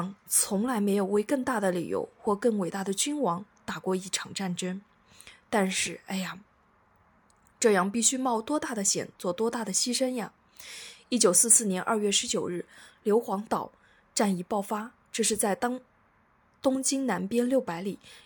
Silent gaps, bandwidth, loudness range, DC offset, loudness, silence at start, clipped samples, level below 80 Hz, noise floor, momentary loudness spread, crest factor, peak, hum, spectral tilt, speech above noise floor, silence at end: none; 19.5 kHz; 7 LU; under 0.1%; -27 LUFS; 0 s; under 0.1%; -70 dBFS; -65 dBFS; 12 LU; 22 dB; -6 dBFS; none; -3 dB/octave; 37 dB; 0.1 s